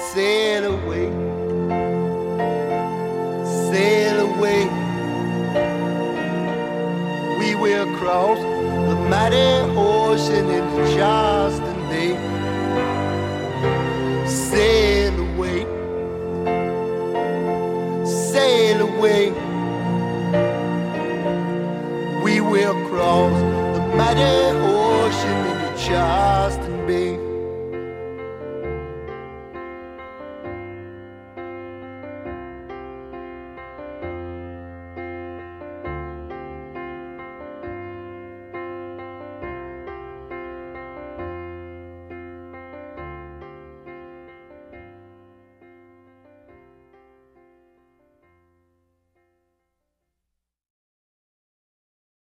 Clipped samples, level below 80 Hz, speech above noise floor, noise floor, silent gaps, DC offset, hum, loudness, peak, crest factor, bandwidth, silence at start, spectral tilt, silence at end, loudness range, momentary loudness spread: under 0.1%; -40 dBFS; 64 dB; -81 dBFS; none; under 0.1%; none; -20 LUFS; -4 dBFS; 18 dB; 15.5 kHz; 0 s; -5.5 dB/octave; 7.4 s; 17 LU; 19 LU